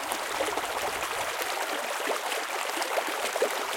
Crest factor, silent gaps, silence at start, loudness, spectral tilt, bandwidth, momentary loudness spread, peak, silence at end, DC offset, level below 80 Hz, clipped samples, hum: 18 dB; none; 0 s; -29 LUFS; -0.5 dB/octave; 17 kHz; 2 LU; -12 dBFS; 0 s; under 0.1%; -64 dBFS; under 0.1%; none